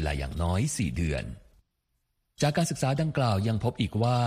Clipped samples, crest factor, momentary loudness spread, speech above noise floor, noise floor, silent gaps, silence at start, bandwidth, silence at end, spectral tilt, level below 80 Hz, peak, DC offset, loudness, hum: under 0.1%; 16 dB; 5 LU; 50 dB; -77 dBFS; none; 0 s; 15 kHz; 0 s; -5.5 dB/octave; -42 dBFS; -12 dBFS; under 0.1%; -28 LUFS; none